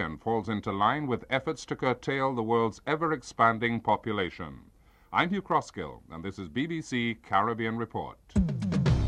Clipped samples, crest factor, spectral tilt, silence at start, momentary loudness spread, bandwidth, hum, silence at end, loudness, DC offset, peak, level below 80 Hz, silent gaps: under 0.1%; 20 dB; -6.5 dB/octave; 0 s; 11 LU; 11 kHz; none; 0 s; -29 LUFS; under 0.1%; -10 dBFS; -44 dBFS; none